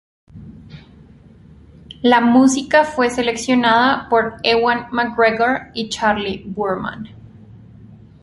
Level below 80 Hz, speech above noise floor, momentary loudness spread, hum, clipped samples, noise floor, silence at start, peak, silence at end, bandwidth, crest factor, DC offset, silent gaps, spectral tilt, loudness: -48 dBFS; 28 dB; 12 LU; none; under 0.1%; -44 dBFS; 0.35 s; -2 dBFS; 0.25 s; 11.5 kHz; 16 dB; under 0.1%; none; -4 dB/octave; -16 LUFS